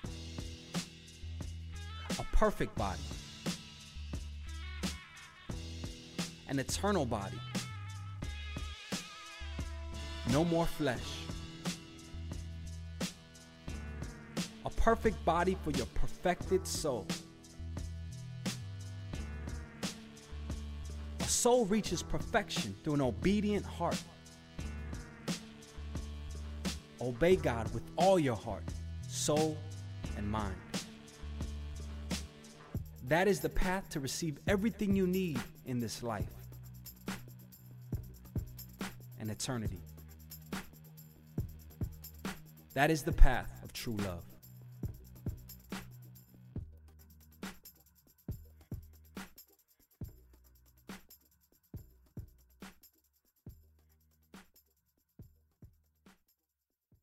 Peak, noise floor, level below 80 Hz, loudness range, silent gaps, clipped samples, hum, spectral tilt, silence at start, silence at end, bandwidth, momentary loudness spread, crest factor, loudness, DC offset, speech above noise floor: -8 dBFS; -87 dBFS; -42 dBFS; 17 LU; none; under 0.1%; none; -5 dB/octave; 0 s; 0.9 s; 16 kHz; 20 LU; 28 dB; -37 LUFS; under 0.1%; 56 dB